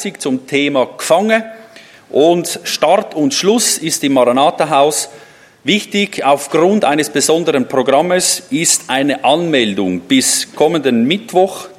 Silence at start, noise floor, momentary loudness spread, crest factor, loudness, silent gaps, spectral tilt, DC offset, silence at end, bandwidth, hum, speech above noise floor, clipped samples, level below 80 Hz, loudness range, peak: 0 s; -39 dBFS; 5 LU; 14 dB; -13 LUFS; none; -3 dB/octave; under 0.1%; 0.05 s; 16 kHz; none; 26 dB; under 0.1%; -62 dBFS; 1 LU; 0 dBFS